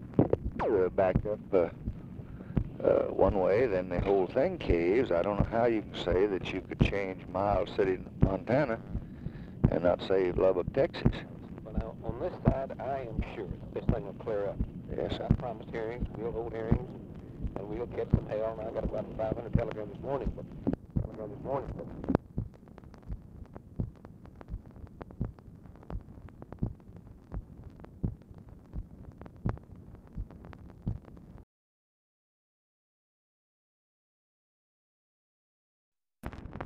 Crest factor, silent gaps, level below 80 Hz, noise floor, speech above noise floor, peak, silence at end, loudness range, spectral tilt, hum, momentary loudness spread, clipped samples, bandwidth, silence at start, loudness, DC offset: 26 dB; 31.43-35.92 s; -44 dBFS; -51 dBFS; 21 dB; -6 dBFS; 0 s; 15 LU; -9 dB/octave; none; 21 LU; under 0.1%; 8 kHz; 0 s; -32 LUFS; under 0.1%